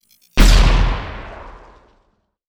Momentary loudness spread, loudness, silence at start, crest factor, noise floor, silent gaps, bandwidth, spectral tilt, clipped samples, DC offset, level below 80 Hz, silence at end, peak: 22 LU; -16 LUFS; 0.35 s; 16 dB; -63 dBFS; none; over 20 kHz; -4.5 dB/octave; under 0.1%; under 0.1%; -16 dBFS; 1 s; 0 dBFS